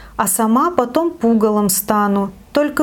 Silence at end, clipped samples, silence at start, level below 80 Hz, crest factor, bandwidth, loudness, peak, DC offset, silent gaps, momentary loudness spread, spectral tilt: 0 s; under 0.1%; 0 s; -46 dBFS; 16 dB; 18 kHz; -16 LUFS; 0 dBFS; under 0.1%; none; 4 LU; -4.5 dB/octave